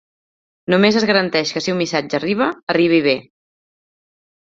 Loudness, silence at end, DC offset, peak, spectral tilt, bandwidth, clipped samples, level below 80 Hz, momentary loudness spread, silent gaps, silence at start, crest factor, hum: -17 LUFS; 1.3 s; under 0.1%; -2 dBFS; -5 dB/octave; 7.8 kHz; under 0.1%; -60 dBFS; 6 LU; 2.63-2.67 s; 0.7 s; 18 dB; none